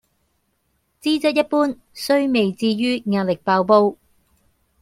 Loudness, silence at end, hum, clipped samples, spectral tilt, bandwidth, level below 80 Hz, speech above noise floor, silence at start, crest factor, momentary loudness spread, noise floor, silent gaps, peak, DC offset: -19 LUFS; 0.9 s; none; under 0.1%; -5.5 dB/octave; 16 kHz; -62 dBFS; 50 dB; 1.05 s; 18 dB; 7 LU; -68 dBFS; none; -2 dBFS; under 0.1%